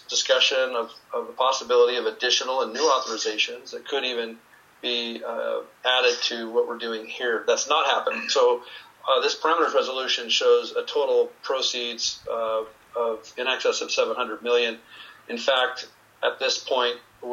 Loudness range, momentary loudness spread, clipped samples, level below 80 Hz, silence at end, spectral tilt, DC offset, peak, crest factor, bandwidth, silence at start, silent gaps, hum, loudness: 4 LU; 11 LU; under 0.1%; -74 dBFS; 0 s; 0 dB/octave; under 0.1%; -6 dBFS; 20 dB; 8 kHz; 0.1 s; none; none; -24 LUFS